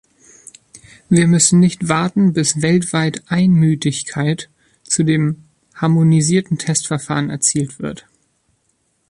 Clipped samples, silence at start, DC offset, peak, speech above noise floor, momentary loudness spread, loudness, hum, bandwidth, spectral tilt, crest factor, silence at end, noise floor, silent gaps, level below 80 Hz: under 0.1%; 1.1 s; under 0.1%; 0 dBFS; 49 dB; 10 LU; -16 LUFS; none; 11.5 kHz; -5 dB/octave; 16 dB; 1.15 s; -64 dBFS; none; -52 dBFS